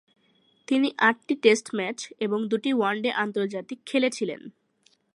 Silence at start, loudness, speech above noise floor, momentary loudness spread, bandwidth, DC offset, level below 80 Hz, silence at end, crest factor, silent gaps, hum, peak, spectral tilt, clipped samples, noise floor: 0.7 s; -25 LUFS; 41 dB; 11 LU; 11.5 kHz; under 0.1%; -80 dBFS; 0.65 s; 22 dB; none; none; -6 dBFS; -4 dB/octave; under 0.1%; -66 dBFS